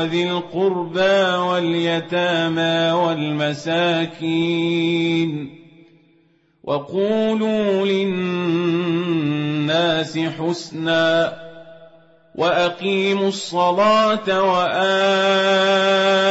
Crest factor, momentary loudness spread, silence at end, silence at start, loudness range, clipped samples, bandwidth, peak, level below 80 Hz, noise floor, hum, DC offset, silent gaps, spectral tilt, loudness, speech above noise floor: 14 dB; 7 LU; 0 s; 0 s; 5 LU; under 0.1%; 8 kHz; -6 dBFS; -62 dBFS; -59 dBFS; none; under 0.1%; none; -5.5 dB/octave; -19 LUFS; 40 dB